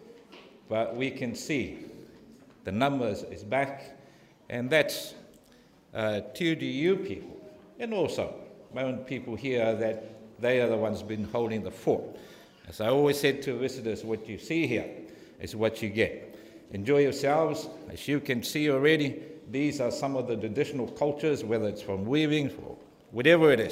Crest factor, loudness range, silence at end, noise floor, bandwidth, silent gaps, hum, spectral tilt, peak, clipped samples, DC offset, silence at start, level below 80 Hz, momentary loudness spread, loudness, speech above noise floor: 22 dB; 5 LU; 0 s; -58 dBFS; 16 kHz; none; none; -5.5 dB/octave; -8 dBFS; under 0.1%; under 0.1%; 0 s; -64 dBFS; 18 LU; -29 LUFS; 30 dB